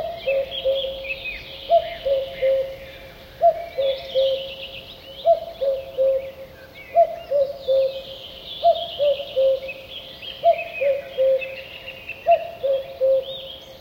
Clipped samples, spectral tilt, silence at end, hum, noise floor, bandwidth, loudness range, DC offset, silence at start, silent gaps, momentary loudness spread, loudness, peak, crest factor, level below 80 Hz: under 0.1%; -4 dB/octave; 0 s; none; -41 dBFS; 16.5 kHz; 2 LU; under 0.1%; 0 s; none; 15 LU; -22 LUFS; -6 dBFS; 16 dB; -52 dBFS